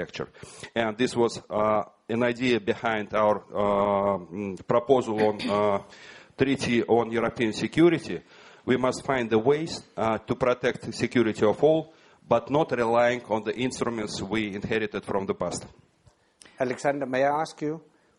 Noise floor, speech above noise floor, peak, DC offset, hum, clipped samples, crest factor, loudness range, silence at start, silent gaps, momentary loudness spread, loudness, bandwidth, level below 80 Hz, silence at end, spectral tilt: -62 dBFS; 36 dB; -6 dBFS; under 0.1%; none; under 0.1%; 20 dB; 5 LU; 0 s; none; 11 LU; -26 LUFS; 11.5 kHz; -58 dBFS; 0.4 s; -5.5 dB/octave